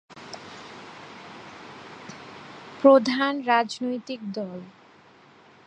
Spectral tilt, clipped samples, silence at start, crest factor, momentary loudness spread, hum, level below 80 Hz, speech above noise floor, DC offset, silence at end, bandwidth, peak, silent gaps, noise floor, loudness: -5 dB/octave; under 0.1%; 0.15 s; 24 dB; 24 LU; none; -74 dBFS; 31 dB; under 0.1%; 1 s; 9.4 kHz; -4 dBFS; none; -53 dBFS; -23 LUFS